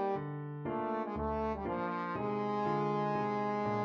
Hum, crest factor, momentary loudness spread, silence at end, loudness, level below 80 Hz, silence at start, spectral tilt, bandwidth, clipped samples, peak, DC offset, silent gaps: none; 12 dB; 5 LU; 0 s; -36 LUFS; -54 dBFS; 0 s; -8.5 dB/octave; 7 kHz; under 0.1%; -22 dBFS; under 0.1%; none